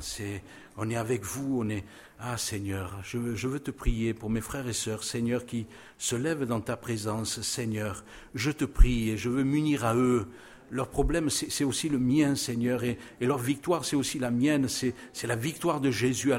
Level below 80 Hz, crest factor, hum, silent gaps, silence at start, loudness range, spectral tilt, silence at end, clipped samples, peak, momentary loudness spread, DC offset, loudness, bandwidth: -36 dBFS; 22 dB; none; none; 0 s; 5 LU; -5 dB/octave; 0 s; under 0.1%; -6 dBFS; 11 LU; under 0.1%; -30 LUFS; 16.5 kHz